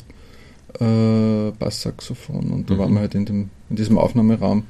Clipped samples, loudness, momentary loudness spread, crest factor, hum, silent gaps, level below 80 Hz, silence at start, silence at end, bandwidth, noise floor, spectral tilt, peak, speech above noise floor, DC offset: under 0.1%; -20 LUFS; 11 LU; 16 dB; none; none; -42 dBFS; 0.1 s; 0 s; 12.5 kHz; -44 dBFS; -7.5 dB/octave; -4 dBFS; 25 dB; under 0.1%